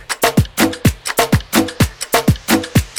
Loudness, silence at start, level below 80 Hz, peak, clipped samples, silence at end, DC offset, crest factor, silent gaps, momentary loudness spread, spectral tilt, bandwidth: -15 LUFS; 0 s; -28 dBFS; 0 dBFS; under 0.1%; 0 s; 0.1%; 14 dB; none; 3 LU; -4.5 dB/octave; over 20 kHz